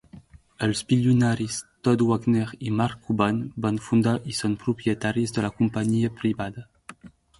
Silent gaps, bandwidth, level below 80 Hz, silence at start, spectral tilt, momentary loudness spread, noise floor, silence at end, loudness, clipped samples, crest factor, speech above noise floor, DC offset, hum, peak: none; 11.5 kHz; -54 dBFS; 0.15 s; -6 dB/octave; 6 LU; -49 dBFS; 0.3 s; -25 LUFS; under 0.1%; 20 dB; 25 dB; under 0.1%; none; -6 dBFS